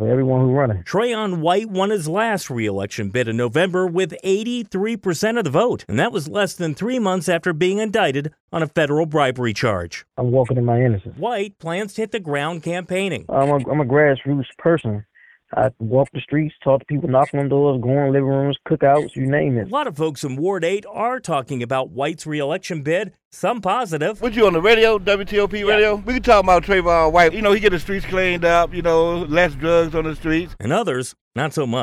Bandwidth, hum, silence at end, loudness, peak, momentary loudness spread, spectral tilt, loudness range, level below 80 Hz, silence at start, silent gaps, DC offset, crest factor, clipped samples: 14.5 kHz; none; 0 s; -19 LUFS; -4 dBFS; 9 LU; -6 dB/octave; 6 LU; -40 dBFS; 0 s; 8.40-8.48 s, 23.25-23.31 s, 31.21-31.31 s; under 0.1%; 16 dB; under 0.1%